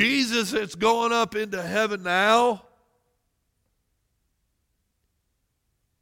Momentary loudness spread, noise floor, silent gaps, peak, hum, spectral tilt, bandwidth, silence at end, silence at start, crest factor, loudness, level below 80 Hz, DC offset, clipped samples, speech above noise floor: 8 LU; -74 dBFS; none; -6 dBFS; none; -3 dB/octave; 17 kHz; 3.45 s; 0 s; 20 dB; -23 LUFS; -64 dBFS; under 0.1%; under 0.1%; 51 dB